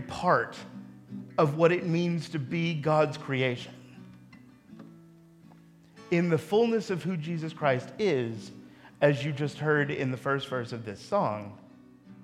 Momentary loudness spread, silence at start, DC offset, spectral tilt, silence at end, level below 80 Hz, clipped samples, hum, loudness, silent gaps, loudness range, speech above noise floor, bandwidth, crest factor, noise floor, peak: 19 LU; 0 s; under 0.1%; -7 dB/octave; 0 s; -68 dBFS; under 0.1%; none; -28 LUFS; none; 4 LU; 27 dB; 13 kHz; 22 dB; -55 dBFS; -8 dBFS